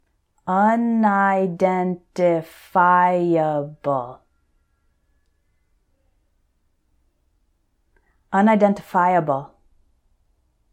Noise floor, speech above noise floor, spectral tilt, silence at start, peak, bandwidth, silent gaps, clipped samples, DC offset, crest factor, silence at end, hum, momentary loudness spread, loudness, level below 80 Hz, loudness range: -66 dBFS; 47 dB; -8 dB/octave; 0.45 s; -4 dBFS; 15 kHz; none; under 0.1%; under 0.1%; 18 dB; 1.25 s; none; 10 LU; -19 LUFS; -64 dBFS; 10 LU